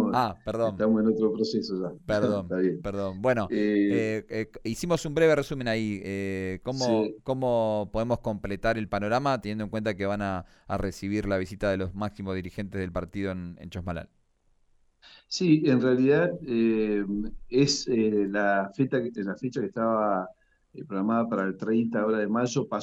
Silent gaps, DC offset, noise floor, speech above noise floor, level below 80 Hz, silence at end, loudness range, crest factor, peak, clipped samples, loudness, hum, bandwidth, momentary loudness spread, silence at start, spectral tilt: none; under 0.1%; -66 dBFS; 39 dB; -50 dBFS; 0 s; 6 LU; 18 dB; -10 dBFS; under 0.1%; -27 LUFS; none; 13 kHz; 10 LU; 0 s; -6 dB/octave